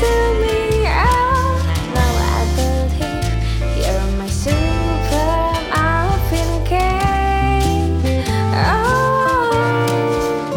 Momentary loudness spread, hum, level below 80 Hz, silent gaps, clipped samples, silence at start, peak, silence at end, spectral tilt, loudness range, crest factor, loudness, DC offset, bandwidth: 4 LU; none; -22 dBFS; none; under 0.1%; 0 s; -4 dBFS; 0 s; -5.5 dB/octave; 2 LU; 12 dB; -17 LUFS; under 0.1%; 18 kHz